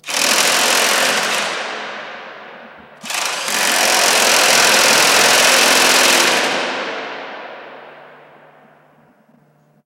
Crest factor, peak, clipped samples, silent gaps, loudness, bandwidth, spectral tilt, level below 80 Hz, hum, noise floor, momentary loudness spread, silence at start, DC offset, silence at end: 16 dB; 0 dBFS; under 0.1%; none; -12 LUFS; 17 kHz; 0.5 dB/octave; -64 dBFS; none; -54 dBFS; 20 LU; 0.05 s; under 0.1%; 1.8 s